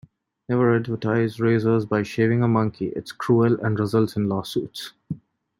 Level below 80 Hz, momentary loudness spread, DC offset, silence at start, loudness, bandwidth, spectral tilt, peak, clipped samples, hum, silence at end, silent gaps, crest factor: -60 dBFS; 14 LU; under 0.1%; 0.5 s; -22 LUFS; 16 kHz; -7.5 dB/octave; -6 dBFS; under 0.1%; none; 0.45 s; none; 16 dB